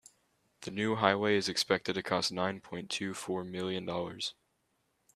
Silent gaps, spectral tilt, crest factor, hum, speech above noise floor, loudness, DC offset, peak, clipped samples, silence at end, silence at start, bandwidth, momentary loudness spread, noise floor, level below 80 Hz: none; -4 dB/octave; 28 dB; none; 44 dB; -33 LUFS; under 0.1%; -8 dBFS; under 0.1%; 0.85 s; 0.6 s; 14 kHz; 11 LU; -77 dBFS; -72 dBFS